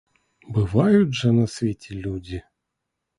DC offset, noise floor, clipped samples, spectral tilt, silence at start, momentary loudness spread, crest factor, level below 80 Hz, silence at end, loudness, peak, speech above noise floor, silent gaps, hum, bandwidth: under 0.1%; -81 dBFS; under 0.1%; -7.5 dB/octave; 0.5 s; 15 LU; 18 dB; -46 dBFS; 0.8 s; -22 LUFS; -4 dBFS; 60 dB; none; none; 11.5 kHz